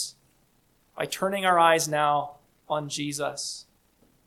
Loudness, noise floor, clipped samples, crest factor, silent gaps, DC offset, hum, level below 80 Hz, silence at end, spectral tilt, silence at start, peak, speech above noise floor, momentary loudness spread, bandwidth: -26 LUFS; -65 dBFS; under 0.1%; 22 dB; none; under 0.1%; none; -68 dBFS; 0.65 s; -3 dB/octave; 0 s; -6 dBFS; 40 dB; 14 LU; 17 kHz